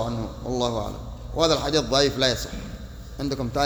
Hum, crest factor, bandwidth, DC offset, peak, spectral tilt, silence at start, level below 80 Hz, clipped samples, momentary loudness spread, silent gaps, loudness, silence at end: none; 20 dB; over 20 kHz; under 0.1%; -4 dBFS; -4 dB/octave; 0 s; -38 dBFS; under 0.1%; 17 LU; none; -24 LUFS; 0 s